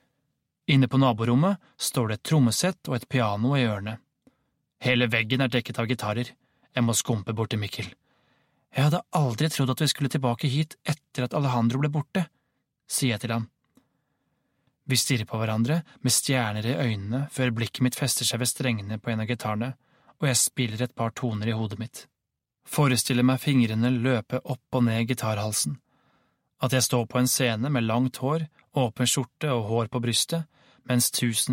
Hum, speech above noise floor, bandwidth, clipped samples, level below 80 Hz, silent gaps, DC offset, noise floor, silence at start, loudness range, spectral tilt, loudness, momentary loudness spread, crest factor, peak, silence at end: none; 59 dB; 16.5 kHz; under 0.1%; -62 dBFS; none; under 0.1%; -84 dBFS; 0.7 s; 4 LU; -4.5 dB/octave; -26 LUFS; 9 LU; 18 dB; -8 dBFS; 0 s